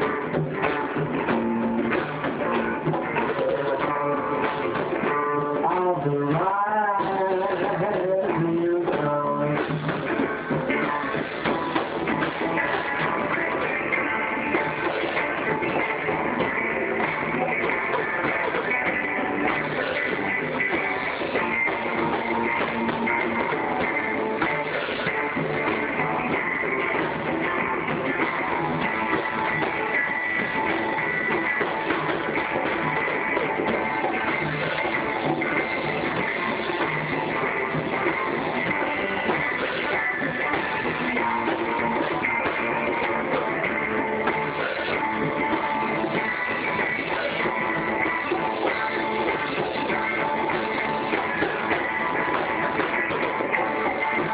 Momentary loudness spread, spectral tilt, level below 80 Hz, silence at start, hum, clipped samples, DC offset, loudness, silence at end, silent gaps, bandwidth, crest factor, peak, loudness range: 2 LU; -3.5 dB/octave; -54 dBFS; 0 s; none; under 0.1%; under 0.1%; -24 LUFS; 0 s; none; 4 kHz; 18 dB; -6 dBFS; 1 LU